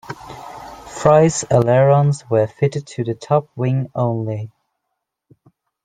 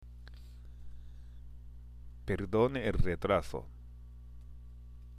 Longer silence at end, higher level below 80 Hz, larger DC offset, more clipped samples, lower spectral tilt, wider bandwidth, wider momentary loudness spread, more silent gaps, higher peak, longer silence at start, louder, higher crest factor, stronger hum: first, 1.4 s vs 0 s; second, -52 dBFS vs -44 dBFS; neither; neither; about the same, -6.5 dB/octave vs -7.5 dB/octave; second, 9.4 kHz vs 12.5 kHz; about the same, 21 LU vs 22 LU; neither; first, -2 dBFS vs -16 dBFS; about the same, 0.1 s vs 0 s; first, -17 LUFS vs -33 LUFS; about the same, 16 dB vs 20 dB; second, none vs 60 Hz at -50 dBFS